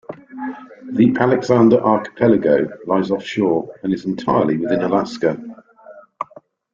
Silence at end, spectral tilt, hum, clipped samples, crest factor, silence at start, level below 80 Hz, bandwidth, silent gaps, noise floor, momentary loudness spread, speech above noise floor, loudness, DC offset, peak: 0.5 s; -7.5 dB/octave; none; under 0.1%; 18 dB; 0.1 s; -56 dBFS; 7.4 kHz; none; -46 dBFS; 18 LU; 30 dB; -17 LUFS; under 0.1%; 0 dBFS